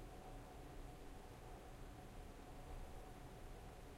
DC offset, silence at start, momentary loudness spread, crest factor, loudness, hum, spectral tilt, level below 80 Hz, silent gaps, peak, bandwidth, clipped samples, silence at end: under 0.1%; 0 s; 2 LU; 12 dB; -58 LUFS; none; -5.5 dB/octave; -58 dBFS; none; -42 dBFS; 16 kHz; under 0.1%; 0 s